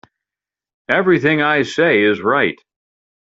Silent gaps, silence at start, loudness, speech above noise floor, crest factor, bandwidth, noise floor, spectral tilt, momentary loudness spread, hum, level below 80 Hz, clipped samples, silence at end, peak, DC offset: none; 0.9 s; -15 LUFS; 73 dB; 16 dB; 8 kHz; -88 dBFS; -6 dB/octave; 6 LU; none; -60 dBFS; under 0.1%; 0.8 s; 0 dBFS; under 0.1%